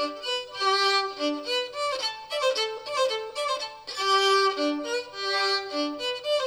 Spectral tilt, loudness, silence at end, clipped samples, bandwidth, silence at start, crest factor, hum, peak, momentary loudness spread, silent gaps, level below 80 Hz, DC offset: -0.5 dB/octave; -26 LUFS; 0 s; under 0.1%; over 20 kHz; 0 s; 16 dB; none; -12 dBFS; 8 LU; none; -70 dBFS; under 0.1%